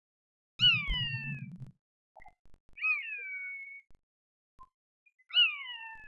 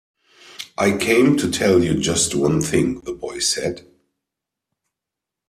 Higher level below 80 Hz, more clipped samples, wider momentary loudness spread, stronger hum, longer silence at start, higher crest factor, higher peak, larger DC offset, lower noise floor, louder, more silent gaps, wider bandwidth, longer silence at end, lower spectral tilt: about the same, -52 dBFS vs -50 dBFS; neither; first, 22 LU vs 13 LU; neither; about the same, 0.6 s vs 0.5 s; about the same, 20 dB vs 18 dB; second, -16 dBFS vs -4 dBFS; neither; first, under -90 dBFS vs -85 dBFS; second, -29 LUFS vs -19 LUFS; first, 1.81-2.15 s, 2.39-2.45 s, 2.60-2.69 s, 4.03-4.58 s, 4.74-5.06 s, 5.14-5.18 s vs none; second, 7.6 kHz vs 15 kHz; second, 0 s vs 1.7 s; about the same, -3 dB/octave vs -4 dB/octave